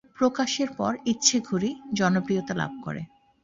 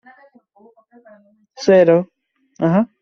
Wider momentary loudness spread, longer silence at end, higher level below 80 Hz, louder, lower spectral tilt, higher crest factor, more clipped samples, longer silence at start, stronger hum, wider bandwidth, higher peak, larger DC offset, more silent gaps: first, 14 LU vs 10 LU; first, 0.35 s vs 0.15 s; about the same, -62 dBFS vs -62 dBFS; second, -26 LUFS vs -15 LUFS; second, -3.5 dB/octave vs -6.5 dB/octave; first, 22 dB vs 16 dB; neither; second, 0.2 s vs 1.6 s; neither; about the same, 7.8 kHz vs 7.2 kHz; second, -6 dBFS vs -2 dBFS; neither; neither